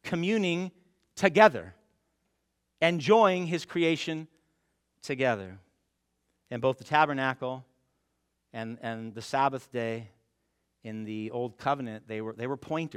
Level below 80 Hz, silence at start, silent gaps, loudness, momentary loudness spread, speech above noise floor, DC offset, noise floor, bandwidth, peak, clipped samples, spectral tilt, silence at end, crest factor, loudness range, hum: -72 dBFS; 0.05 s; none; -28 LUFS; 18 LU; 50 dB; under 0.1%; -78 dBFS; 14.5 kHz; -4 dBFS; under 0.1%; -5.5 dB/octave; 0 s; 26 dB; 9 LU; none